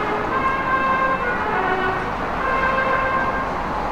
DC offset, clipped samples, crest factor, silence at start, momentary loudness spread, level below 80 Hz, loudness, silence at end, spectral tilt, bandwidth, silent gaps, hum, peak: under 0.1%; under 0.1%; 14 dB; 0 s; 5 LU; -38 dBFS; -20 LUFS; 0 s; -6 dB/octave; 15.5 kHz; none; none; -6 dBFS